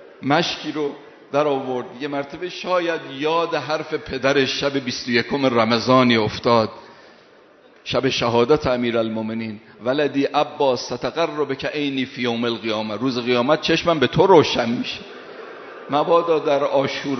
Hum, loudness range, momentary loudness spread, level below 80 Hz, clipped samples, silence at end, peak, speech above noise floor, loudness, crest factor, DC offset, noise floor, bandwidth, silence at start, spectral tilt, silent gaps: none; 4 LU; 11 LU; -54 dBFS; under 0.1%; 0 s; 0 dBFS; 30 dB; -20 LUFS; 20 dB; under 0.1%; -50 dBFS; 6.4 kHz; 0 s; -3.5 dB/octave; none